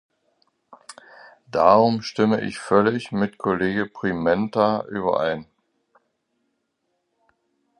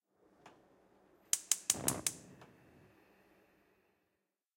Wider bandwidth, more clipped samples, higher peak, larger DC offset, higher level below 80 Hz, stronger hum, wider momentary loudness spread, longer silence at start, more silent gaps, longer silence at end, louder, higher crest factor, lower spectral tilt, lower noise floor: second, 11 kHz vs 16.5 kHz; neither; first, -2 dBFS vs -10 dBFS; neither; first, -58 dBFS vs -74 dBFS; neither; second, 9 LU vs 18 LU; first, 0.7 s vs 0.45 s; neither; first, 2.35 s vs 2.1 s; first, -21 LUFS vs -35 LUFS; second, 22 dB vs 34 dB; first, -6.5 dB/octave vs -1 dB/octave; second, -74 dBFS vs -86 dBFS